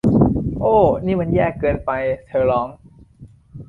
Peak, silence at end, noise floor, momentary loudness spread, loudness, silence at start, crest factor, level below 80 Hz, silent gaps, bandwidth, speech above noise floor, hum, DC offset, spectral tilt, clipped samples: -2 dBFS; 0.05 s; -45 dBFS; 7 LU; -18 LUFS; 0.05 s; 16 dB; -36 dBFS; none; 4.6 kHz; 27 dB; none; under 0.1%; -10 dB/octave; under 0.1%